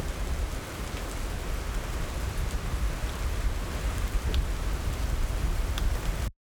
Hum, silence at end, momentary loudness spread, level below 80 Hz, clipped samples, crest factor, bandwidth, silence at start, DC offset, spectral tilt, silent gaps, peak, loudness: none; 0.15 s; 4 LU; -30 dBFS; under 0.1%; 14 dB; over 20 kHz; 0 s; under 0.1%; -5 dB/octave; none; -14 dBFS; -33 LUFS